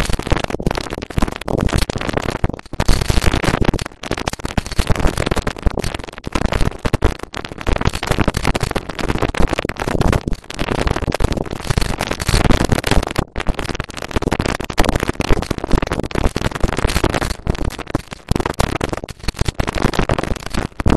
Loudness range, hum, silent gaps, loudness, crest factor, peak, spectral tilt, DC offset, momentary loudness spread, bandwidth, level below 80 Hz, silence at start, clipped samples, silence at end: 2 LU; none; none; -20 LUFS; 18 dB; 0 dBFS; -5 dB/octave; 2%; 7 LU; 13 kHz; -22 dBFS; 0 s; under 0.1%; 0 s